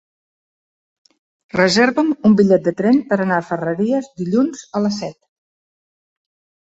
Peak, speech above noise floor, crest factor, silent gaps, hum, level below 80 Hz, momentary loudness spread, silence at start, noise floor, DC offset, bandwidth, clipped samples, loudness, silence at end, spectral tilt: -2 dBFS; over 74 dB; 16 dB; none; none; -58 dBFS; 8 LU; 1.55 s; under -90 dBFS; under 0.1%; 8 kHz; under 0.1%; -17 LUFS; 1.55 s; -6 dB/octave